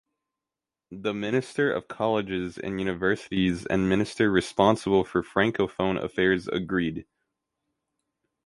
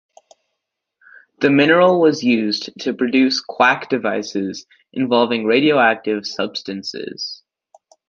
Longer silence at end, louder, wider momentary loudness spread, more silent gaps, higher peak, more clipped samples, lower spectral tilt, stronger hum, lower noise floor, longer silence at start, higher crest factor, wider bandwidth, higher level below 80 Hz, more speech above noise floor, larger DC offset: first, 1.45 s vs 0.75 s; second, -26 LUFS vs -17 LUFS; second, 9 LU vs 15 LU; neither; second, -4 dBFS vs 0 dBFS; neither; about the same, -6 dB/octave vs -5 dB/octave; neither; first, -89 dBFS vs -78 dBFS; second, 0.9 s vs 1.4 s; about the same, 22 dB vs 18 dB; first, 11.5 kHz vs 7.4 kHz; first, -52 dBFS vs -66 dBFS; about the same, 64 dB vs 61 dB; neither